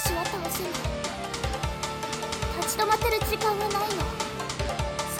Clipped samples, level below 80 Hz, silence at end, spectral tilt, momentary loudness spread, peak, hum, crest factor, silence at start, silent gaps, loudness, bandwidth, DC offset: under 0.1%; -38 dBFS; 0 s; -3.5 dB/octave; 7 LU; -10 dBFS; none; 18 dB; 0 s; none; -28 LUFS; 17 kHz; under 0.1%